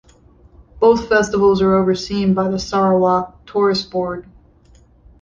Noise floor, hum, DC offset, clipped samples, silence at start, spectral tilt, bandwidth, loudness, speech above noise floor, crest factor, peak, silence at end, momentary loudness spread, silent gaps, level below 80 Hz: -49 dBFS; none; under 0.1%; under 0.1%; 0.75 s; -6 dB/octave; 7.4 kHz; -16 LUFS; 34 dB; 16 dB; -2 dBFS; 1 s; 9 LU; none; -44 dBFS